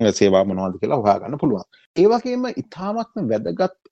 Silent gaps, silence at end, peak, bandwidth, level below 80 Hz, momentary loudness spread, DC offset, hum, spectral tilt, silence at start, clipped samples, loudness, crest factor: 1.86-1.94 s; 0.25 s; -2 dBFS; 8.4 kHz; -60 dBFS; 11 LU; under 0.1%; none; -6 dB/octave; 0 s; under 0.1%; -20 LUFS; 18 dB